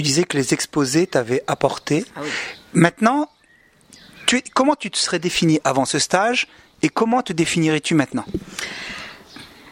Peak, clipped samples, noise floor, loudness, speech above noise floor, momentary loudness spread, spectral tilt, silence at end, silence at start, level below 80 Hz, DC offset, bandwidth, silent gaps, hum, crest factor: 0 dBFS; under 0.1%; -55 dBFS; -20 LUFS; 35 dB; 12 LU; -4 dB/octave; 0 s; 0 s; -52 dBFS; under 0.1%; 16 kHz; none; none; 20 dB